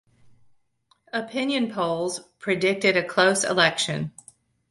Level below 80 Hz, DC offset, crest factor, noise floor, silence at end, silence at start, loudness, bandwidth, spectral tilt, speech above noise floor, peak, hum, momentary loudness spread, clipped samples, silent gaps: -64 dBFS; under 0.1%; 20 dB; -66 dBFS; 0.6 s; 1.15 s; -23 LUFS; 11.5 kHz; -3.5 dB/octave; 43 dB; -4 dBFS; none; 12 LU; under 0.1%; none